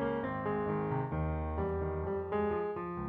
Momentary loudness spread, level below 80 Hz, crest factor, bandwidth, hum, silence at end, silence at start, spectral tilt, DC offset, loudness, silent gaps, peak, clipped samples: 2 LU; -46 dBFS; 12 dB; 4.4 kHz; none; 0 s; 0 s; -11 dB/octave; under 0.1%; -35 LUFS; none; -22 dBFS; under 0.1%